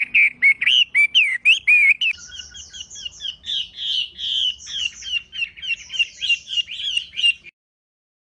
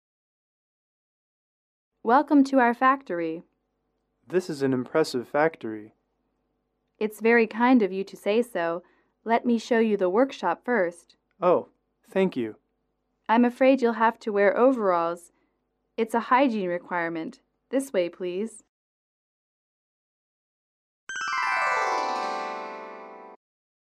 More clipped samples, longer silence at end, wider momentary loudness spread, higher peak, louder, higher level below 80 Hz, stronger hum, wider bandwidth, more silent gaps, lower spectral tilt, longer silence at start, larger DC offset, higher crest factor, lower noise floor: neither; first, 0.8 s vs 0.55 s; about the same, 17 LU vs 15 LU; about the same, -6 dBFS vs -8 dBFS; first, -17 LUFS vs -25 LUFS; first, -58 dBFS vs -78 dBFS; neither; second, 10.5 kHz vs 14 kHz; second, none vs 18.69-21.07 s; second, 3 dB/octave vs -5.5 dB/octave; second, 0 s vs 2.05 s; neither; about the same, 16 dB vs 18 dB; second, -38 dBFS vs -76 dBFS